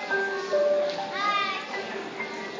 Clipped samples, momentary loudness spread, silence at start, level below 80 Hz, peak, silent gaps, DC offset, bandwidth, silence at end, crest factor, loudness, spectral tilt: under 0.1%; 9 LU; 0 s; -74 dBFS; -16 dBFS; none; under 0.1%; 7.6 kHz; 0 s; 12 dB; -27 LUFS; -3 dB/octave